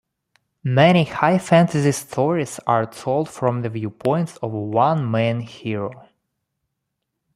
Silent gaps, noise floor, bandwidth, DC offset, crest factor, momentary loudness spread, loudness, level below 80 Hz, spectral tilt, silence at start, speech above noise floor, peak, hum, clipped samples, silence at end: none; -78 dBFS; 14.5 kHz; under 0.1%; 20 dB; 12 LU; -20 LUFS; -60 dBFS; -6.5 dB/octave; 0.65 s; 59 dB; -2 dBFS; none; under 0.1%; 1.35 s